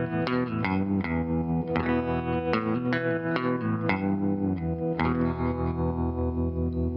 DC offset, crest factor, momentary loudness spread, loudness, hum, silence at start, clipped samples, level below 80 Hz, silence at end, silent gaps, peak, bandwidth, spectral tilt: under 0.1%; 20 dB; 2 LU; -28 LUFS; none; 0 s; under 0.1%; -40 dBFS; 0 s; none; -6 dBFS; 5.8 kHz; -9.5 dB/octave